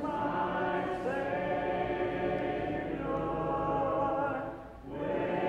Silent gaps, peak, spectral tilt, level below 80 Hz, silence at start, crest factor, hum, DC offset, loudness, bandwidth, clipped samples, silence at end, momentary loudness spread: none; -20 dBFS; -8 dB/octave; -52 dBFS; 0 s; 12 dB; none; under 0.1%; -33 LUFS; 10 kHz; under 0.1%; 0 s; 5 LU